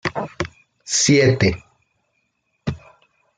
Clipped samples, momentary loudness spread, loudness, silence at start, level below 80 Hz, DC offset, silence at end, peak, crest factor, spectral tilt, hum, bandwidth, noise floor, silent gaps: under 0.1%; 20 LU; -19 LUFS; 0.05 s; -48 dBFS; under 0.1%; 0.6 s; -4 dBFS; 18 dB; -4 dB/octave; none; 10 kHz; -70 dBFS; none